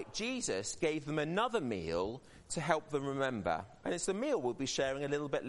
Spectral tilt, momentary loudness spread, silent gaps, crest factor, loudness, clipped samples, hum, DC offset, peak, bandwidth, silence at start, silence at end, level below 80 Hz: -4 dB/octave; 5 LU; none; 22 dB; -36 LUFS; under 0.1%; none; under 0.1%; -14 dBFS; 11.5 kHz; 0 s; 0 s; -62 dBFS